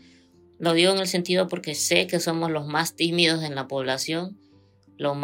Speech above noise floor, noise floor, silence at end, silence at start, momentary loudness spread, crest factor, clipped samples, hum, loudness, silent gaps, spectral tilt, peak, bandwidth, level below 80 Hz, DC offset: 33 dB; -57 dBFS; 0 s; 0.6 s; 9 LU; 22 dB; under 0.1%; none; -23 LUFS; none; -3.5 dB/octave; -4 dBFS; 16.5 kHz; -76 dBFS; under 0.1%